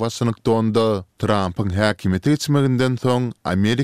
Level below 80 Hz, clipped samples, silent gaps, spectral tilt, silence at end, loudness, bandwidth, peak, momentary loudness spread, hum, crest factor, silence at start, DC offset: -48 dBFS; under 0.1%; none; -6.5 dB/octave; 0 s; -20 LUFS; 15 kHz; -2 dBFS; 4 LU; none; 16 dB; 0 s; 0.3%